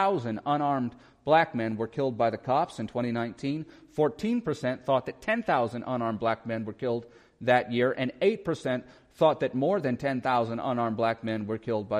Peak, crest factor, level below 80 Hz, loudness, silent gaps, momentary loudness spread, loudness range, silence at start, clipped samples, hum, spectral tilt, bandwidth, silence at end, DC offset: -10 dBFS; 18 dB; -64 dBFS; -28 LUFS; none; 8 LU; 2 LU; 0 s; under 0.1%; none; -7 dB/octave; 11 kHz; 0 s; under 0.1%